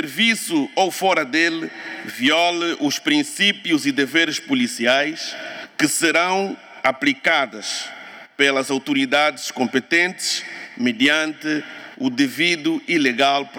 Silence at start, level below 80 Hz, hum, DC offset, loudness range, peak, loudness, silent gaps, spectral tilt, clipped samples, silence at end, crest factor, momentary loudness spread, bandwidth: 0 s; -70 dBFS; none; under 0.1%; 1 LU; -2 dBFS; -19 LUFS; none; -2.5 dB/octave; under 0.1%; 0 s; 18 dB; 11 LU; 18 kHz